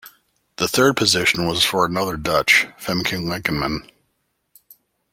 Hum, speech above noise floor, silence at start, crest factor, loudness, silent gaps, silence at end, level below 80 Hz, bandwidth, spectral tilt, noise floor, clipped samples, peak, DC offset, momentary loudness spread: none; 52 dB; 0.05 s; 20 dB; -18 LUFS; none; 1.3 s; -48 dBFS; 16.5 kHz; -3 dB/octave; -71 dBFS; under 0.1%; -2 dBFS; under 0.1%; 9 LU